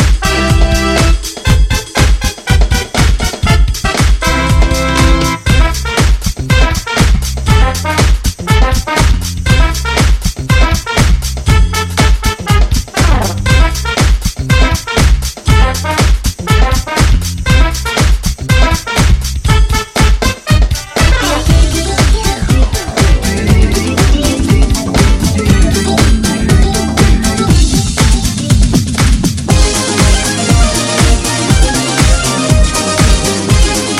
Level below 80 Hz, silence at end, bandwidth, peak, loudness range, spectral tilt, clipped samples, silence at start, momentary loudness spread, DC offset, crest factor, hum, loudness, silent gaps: -12 dBFS; 0 s; 15 kHz; 0 dBFS; 1 LU; -4.5 dB/octave; under 0.1%; 0 s; 3 LU; 0.1%; 10 dB; none; -11 LUFS; none